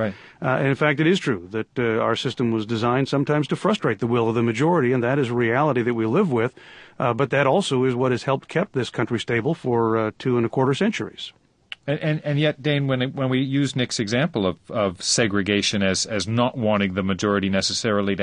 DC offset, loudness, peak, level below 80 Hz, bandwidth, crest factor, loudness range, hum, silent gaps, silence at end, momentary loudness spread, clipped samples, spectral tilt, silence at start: under 0.1%; -22 LUFS; -4 dBFS; -52 dBFS; 10.5 kHz; 18 dB; 3 LU; none; none; 0 s; 5 LU; under 0.1%; -5 dB/octave; 0 s